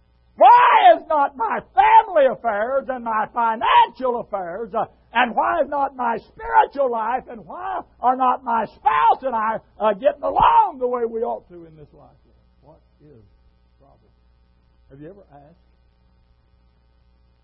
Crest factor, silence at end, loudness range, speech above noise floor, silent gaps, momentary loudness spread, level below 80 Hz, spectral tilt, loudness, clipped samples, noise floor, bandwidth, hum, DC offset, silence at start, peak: 18 dB; 2.3 s; 6 LU; 37 dB; none; 13 LU; -52 dBFS; -8.5 dB/octave; -18 LUFS; under 0.1%; -58 dBFS; 5.4 kHz; none; under 0.1%; 0.4 s; -2 dBFS